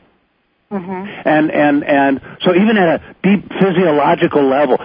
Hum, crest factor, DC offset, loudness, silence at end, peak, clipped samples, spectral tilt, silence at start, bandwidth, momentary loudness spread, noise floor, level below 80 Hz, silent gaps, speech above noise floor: none; 14 dB; under 0.1%; -14 LUFS; 0 s; 0 dBFS; under 0.1%; -10.5 dB/octave; 0.7 s; 5.2 kHz; 12 LU; -61 dBFS; -52 dBFS; none; 48 dB